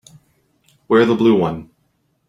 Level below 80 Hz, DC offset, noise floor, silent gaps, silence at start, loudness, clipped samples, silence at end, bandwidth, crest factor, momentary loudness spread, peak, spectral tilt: -56 dBFS; under 0.1%; -65 dBFS; none; 0.9 s; -15 LUFS; under 0.1%; 0.65 s; 10 kHz; 18 dB; 11 LU; -2 dBFS; -7.5 dB/octave